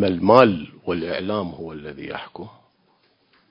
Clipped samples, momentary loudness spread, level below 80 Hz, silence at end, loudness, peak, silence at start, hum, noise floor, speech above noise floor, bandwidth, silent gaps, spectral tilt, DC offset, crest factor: under 0.1%; 22 LU; -52 dBFS; 1 s; -19 LUFS; 0 dBFS; 0 s; none; -63 dBFS; 42 dB; 6.6 kHz; none; -8.5 dB/octave; under 0.1%; 22 dB